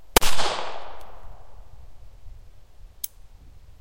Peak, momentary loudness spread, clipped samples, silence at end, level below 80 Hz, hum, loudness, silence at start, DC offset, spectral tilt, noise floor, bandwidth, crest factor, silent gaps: 0 dBFS; 29 LU; under 0.1%; 0.2 s; -36 dBFS; none; -27 LUFS; 0 s; under 0.1%; -2 dB/octave; -46 dBFS; 16.5 kHz; 22 dB; none